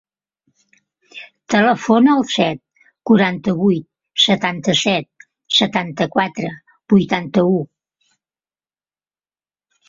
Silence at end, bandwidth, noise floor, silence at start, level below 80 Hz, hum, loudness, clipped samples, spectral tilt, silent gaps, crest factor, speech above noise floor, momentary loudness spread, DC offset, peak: 2.25 s; 7.8 kHz; under -90 dBFS; 1.15 s; -58 dBFS; none; -16 LUFS; under 0.1%; -5 dB/octave; none; 18 dB; over 74 dB; 14 LU; under 0.1%; -2 dBFS